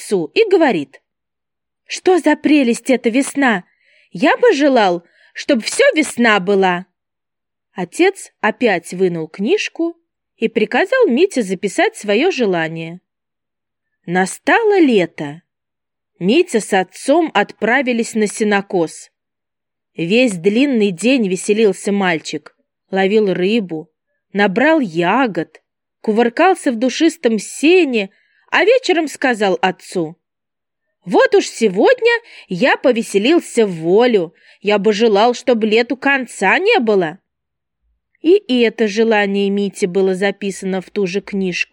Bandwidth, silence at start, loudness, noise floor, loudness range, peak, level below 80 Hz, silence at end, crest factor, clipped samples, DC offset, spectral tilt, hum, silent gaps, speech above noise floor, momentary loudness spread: 18.5 kHz; 0 s; -15 LUFS; -86 dBFS; 3 LU; 0 dBFS; -72 dBFS; 0.1 s; 16 dB; under 0.1%; under 0.1%; -4.5 dB/octave; none; none; 71 dB; 11 LU